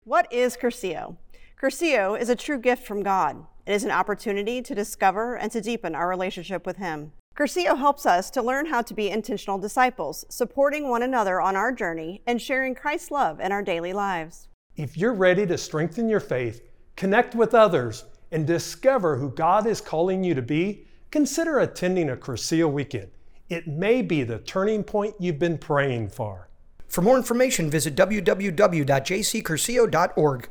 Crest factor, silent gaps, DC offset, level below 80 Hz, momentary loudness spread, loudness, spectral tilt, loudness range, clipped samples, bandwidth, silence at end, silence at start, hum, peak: 20 dB; 7.20-7.32 s, 14.54-14.70 s; under 0.1%; -50 dBFS; 11 LU; -24 LUFS; -5 dB/octave; 4 LU; under 0.1%; over 20 kHz; 0 s; 0.05 s; none; -4 dBFS